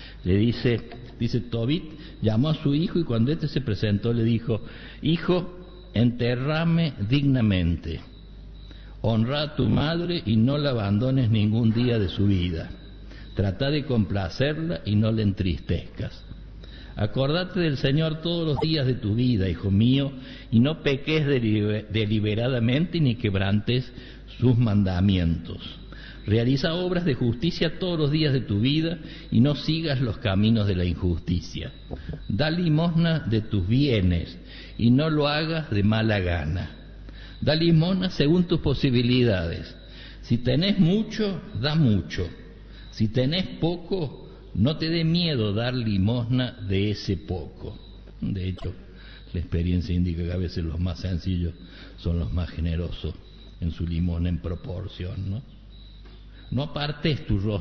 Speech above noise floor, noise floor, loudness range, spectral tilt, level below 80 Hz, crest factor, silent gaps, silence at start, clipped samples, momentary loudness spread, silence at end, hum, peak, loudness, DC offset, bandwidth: 21 dB; -44 dBFS; 6 LU; -6 dB/octave; -40 dBFS; 16 dB; none; 0 s; under 0.1%; 16 LU; 0 s; none; -8 dBFS; -25 LUFS; under 0.1%; 6.4 kHz